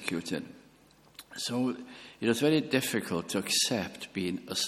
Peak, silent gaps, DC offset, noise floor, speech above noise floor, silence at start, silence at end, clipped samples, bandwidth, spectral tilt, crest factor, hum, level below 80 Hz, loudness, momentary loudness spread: -10 dBFS; none; under 0.1%; -60 dBFS; 29 dB; 0 s; 0 s; under 0.1%; 16.5 kHz; -3.5 dB/octave; 22 dB; none; -68 dBFS; -30 LUFS; 16 LU